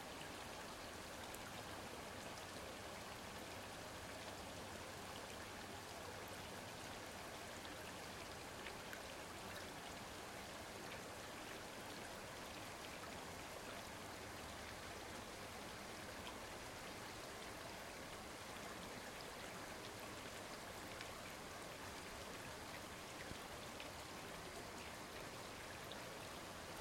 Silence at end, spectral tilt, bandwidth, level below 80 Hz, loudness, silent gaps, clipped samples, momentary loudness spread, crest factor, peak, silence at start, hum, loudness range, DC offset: 0 s; -3 dB/octave; 16.5 kHz; -68 dBFS; -51 LUFS; none; under 0.1%; 1 LU; 22 dB; -30 dBFS; 0 s; none; 0 LU; under 0.1%